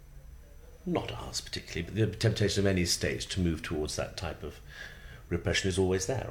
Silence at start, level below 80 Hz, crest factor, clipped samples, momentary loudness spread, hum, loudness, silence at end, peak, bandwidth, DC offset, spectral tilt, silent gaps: 0 s; -48 dBFS; 18 dB; under 0.1%; 16 LU; none; -31 LUFS; 0 s; -14 dBFS; 18 kHz; under 0.1%; -4.5 dB/octave; none